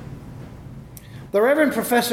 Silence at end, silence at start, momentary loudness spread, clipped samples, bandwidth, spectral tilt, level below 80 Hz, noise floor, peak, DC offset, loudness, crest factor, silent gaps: 0 s; 0 s; 22 LU; under 0.1%; 17 kHz; -4.5 dB/octave; -48 dBFS; -39 dBFS; -6 dBFS; under 0.1%; -19 LUFS; 16 dB; none